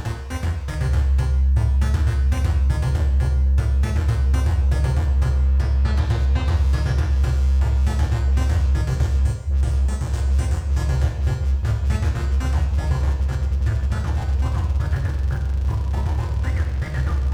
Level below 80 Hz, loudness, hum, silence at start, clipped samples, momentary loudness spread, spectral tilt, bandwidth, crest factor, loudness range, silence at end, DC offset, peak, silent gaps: -20 dBFS; -21 LUFS; none; 0 s; under 0.1%; 4 LU; -7 dB/octave; 9.6 kHz; 12 dB; 3 LU; 0 s; under 0.1%; -8 dBFS; none